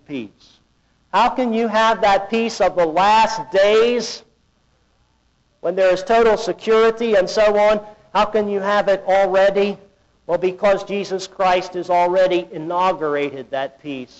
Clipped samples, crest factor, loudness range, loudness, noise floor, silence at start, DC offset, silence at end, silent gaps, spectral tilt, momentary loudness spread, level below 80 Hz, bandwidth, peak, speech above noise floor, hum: under 0.1%; 10 dB; 3 LU; -18 LUFS; -61 dBFS; 0.1 s; under 0.1%; 0.15 s; none; -4.5 dB/octave; 11 LU; -50 dBFS; 8.2 kHz; -8 dBFS; 44 dB; none